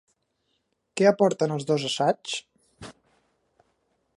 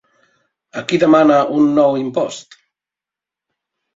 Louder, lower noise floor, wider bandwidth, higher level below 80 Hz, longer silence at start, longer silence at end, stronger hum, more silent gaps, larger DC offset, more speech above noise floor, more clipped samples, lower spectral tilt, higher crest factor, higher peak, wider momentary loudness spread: second, -24 LUFS vs -14 LUFS; second, -74 dBFS vs -87 dBFS; first, 11.5 kHz vs 7.8 kHz; second, -70 dBFS vs -60 dBFS; first, 0.95 s vs 0.75 s; second, 1.25 s vs 1.55 s; neither; neither; neither; second, 51 dB vs 74 dB; neither; about the same, -5 dB/octave vs -6 dB/octave; first, 22 dB vs 16 dB; second, -6 dBFS vs -2 dBFS; first, 25 LU vs 16 LU